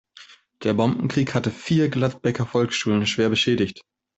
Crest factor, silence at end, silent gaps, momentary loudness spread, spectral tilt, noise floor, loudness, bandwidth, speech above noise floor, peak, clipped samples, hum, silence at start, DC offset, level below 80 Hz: 16 dB; 0.35 s; none; 5 LU; -5.5 dB/octave; -49 dBFS; -22 LUFS; 8.2 kHz; 27 dB; -6 dBFS; under 0.1%; none; 0.2 s; under 0.1%; -56 dBFS